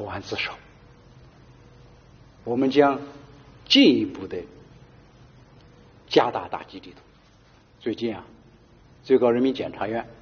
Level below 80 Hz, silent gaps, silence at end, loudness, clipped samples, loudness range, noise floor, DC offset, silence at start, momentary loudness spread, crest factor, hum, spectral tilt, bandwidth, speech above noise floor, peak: -58 dBFS; none; 0.1 s; -23 LUFS; under 0.1%; 7 LU; -55 dBFS; under 0.1%; 0 s; 22 LU; 22 dB; none; -3 dB/octave; 6.8 kHz; 32 dB; -4 dBFS